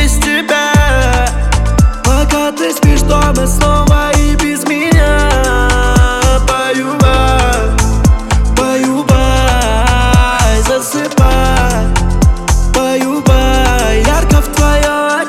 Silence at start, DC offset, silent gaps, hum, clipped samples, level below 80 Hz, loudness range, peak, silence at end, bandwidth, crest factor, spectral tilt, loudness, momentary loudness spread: 0 s; under 0.1%; none; none; under 0.1%; -12 dBFS; 1 LU; 0 dBFS; 0 s; 15.5 kHz; 10 dB; -5 dB/octave; -11 LUFS; 4 LU